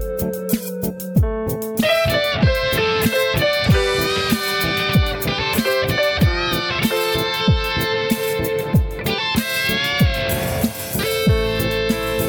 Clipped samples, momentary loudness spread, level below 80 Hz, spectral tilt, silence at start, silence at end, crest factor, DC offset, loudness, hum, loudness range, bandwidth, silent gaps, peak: under 0.1%; 5 LU; -30 dBFS; -5 dB/octave; 0 s; 0 s; 14 dB; under 0.1%; -19 LUFS; none; 2 LU; over 20 kHz; none; -4 dBFS